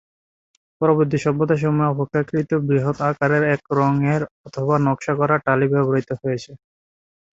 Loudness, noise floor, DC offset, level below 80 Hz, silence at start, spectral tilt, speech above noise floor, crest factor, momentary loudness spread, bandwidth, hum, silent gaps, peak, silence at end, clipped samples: -20 LUFS; under -90 dBFS; under 0.1%; -56 dBFS; 0.8 s; -8.5 dB/octave; over 71 dB; 18 dB; 7 LU; 7.8 kHz; none; 4.31-4.44 s; -2 dBFS; 0.8 s; under 0.1%